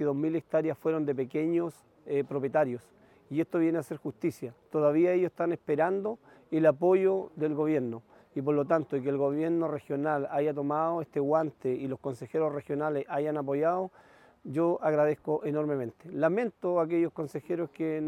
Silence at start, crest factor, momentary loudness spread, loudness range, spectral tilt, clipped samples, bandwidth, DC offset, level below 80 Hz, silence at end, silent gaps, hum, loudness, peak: 0 s; 18 dB; 9 LU; 3 LU; -8.5 dB/octave; under 0.1%; 13 kHz; under 0.1%; -76 dBFS; 0 s; none; none; -30 LUFS; -10 dBFS